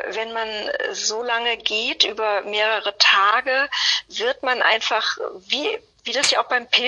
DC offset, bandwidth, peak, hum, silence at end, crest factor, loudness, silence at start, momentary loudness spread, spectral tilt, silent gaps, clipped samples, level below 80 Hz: under 0.1%; 11.5 kHz; -2 dBFS; none; 0 s; 20 dB; -20 LUFS; 0 s; 9 LU; 1 dB/octave; none; under 0.1%; -64 dBFS